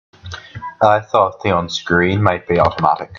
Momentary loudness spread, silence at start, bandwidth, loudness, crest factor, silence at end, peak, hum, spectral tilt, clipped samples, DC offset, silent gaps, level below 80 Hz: 18 LU; 0.25 s; 7.4 kHz; -16 LUFS; 16 dB; 0 s; 0 dBFS; none; -6 dB/octave; under 0.1%; under 0.1%; none; -46 dBFS